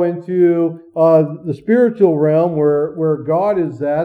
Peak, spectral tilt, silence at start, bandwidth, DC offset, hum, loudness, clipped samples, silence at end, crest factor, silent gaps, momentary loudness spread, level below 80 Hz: -2 dBFS; -10.5 dB/octave; 0 s; 4.9 kHz; under 0.1%; none; -15 LUFS; under 0.1%; 0 s; 14 dB; none; 6 LU; -60 dBFS